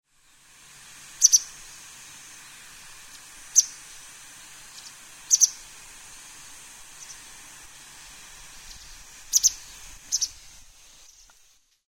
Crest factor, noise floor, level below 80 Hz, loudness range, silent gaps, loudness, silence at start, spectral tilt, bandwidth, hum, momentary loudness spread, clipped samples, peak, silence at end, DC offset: 28 dB; -60 dBFS; -58 dBFS; 10 LU; none; -21 LUFS; 1.2 s; 3.5 dB/octave; 16 kHz; none; 25 LU; under 0.1%; -2 dBFS; 1.55 s; under 0.1%